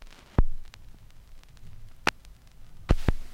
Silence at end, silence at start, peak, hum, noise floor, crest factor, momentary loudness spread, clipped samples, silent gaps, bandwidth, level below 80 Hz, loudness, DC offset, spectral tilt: 0 s; 0 s; -4 dBFS; none; -49 dBFS; 26 dB; 24 LU; under 0.1%; none; 11 kHz; -32 dBFS; -31 LUFS; under 0.1%; -5.5 dB/octave